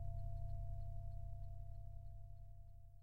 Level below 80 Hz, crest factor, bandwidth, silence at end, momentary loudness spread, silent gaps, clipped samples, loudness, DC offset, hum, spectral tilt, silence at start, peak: -52 dBFS; 12 dB; 4.5 kHz; 0 s; 11 LU; none; under 0.1%; -53 LUFS; 0.2%; none; -10 dB/octave; 0 s; -36 dBFS